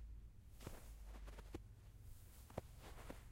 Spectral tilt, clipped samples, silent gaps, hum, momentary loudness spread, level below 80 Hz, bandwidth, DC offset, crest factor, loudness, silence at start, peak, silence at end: -5.5 dB/octave; under 0.1%; none; none; 7 LU; -58 dBFS; 16 kHz; under 0.1%; 26 dB; -58 LUFS; 0 s; -30 dBFS; 0 s